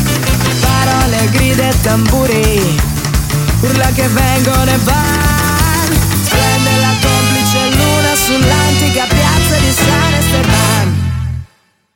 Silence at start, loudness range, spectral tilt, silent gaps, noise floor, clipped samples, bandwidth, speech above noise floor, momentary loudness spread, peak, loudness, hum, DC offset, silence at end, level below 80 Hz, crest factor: 0 s; 1 LU; -4.5 dB/octave; none; -51 dBFS; under 0.1%; 17 kHz; 40 dB; 3 LU; 0 dBFS; -11 LUFS; none; under 0.1%; 0.5 s; -20 dBFS; 10 dB